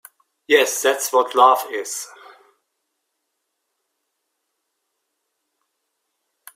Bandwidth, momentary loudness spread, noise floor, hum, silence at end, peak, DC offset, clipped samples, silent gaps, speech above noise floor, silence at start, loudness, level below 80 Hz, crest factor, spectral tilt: 16 kHz; 14 LU; -76 dBFS; none; 4.5 s; 0 dBFS; under 0.1%; under 0.1%; none; 59 dB; 0.5 s; -17 LUFS; -76 dBFS; 22 dB; 0.5 dB/octave